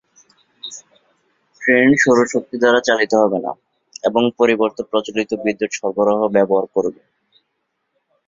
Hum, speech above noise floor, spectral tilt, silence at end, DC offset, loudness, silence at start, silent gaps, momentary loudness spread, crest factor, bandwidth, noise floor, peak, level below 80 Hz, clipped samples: none; 56 dB; -4.5 dB/octave; 1.35 s; under 0.1%; -17 LUFS; 0.65 s; none; 16 LU; 18 dB; 7.8 kHz; -72 dBFS; 0 dBFS; -60 dBFS; under 0.1%